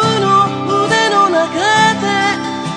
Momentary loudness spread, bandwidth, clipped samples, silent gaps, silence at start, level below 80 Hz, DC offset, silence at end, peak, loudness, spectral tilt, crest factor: 4 LU; 10.5 kHz; under 0.1%; none; 0 s; -54 dBFS; under 0.1%; 0 s; 0 dBFS; -13 LUFS; -4 dB/octave; 12 dB